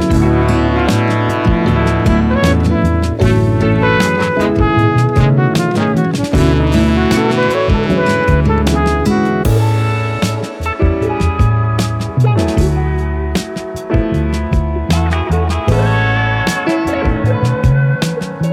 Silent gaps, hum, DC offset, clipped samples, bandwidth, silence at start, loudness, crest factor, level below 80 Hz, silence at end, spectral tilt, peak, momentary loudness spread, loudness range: none; none; under 0.1%; under 0.1%; 14.5 kHz; 0 s; -14 LUFS; 12 dB; -22 dBFS; 0 s; -7 dB/octave; 0 dBFS; 5 LU; 3 LU